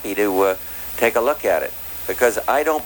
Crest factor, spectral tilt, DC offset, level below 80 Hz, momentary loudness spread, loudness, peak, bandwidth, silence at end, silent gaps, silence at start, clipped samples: 16 dB; -3 dB/octave; under 0.1%; -48 dBFS; 8 LU; -20 LUFS; -4 dBFS; over 20 kHz; 0 s; none; 0 s; under 0.1%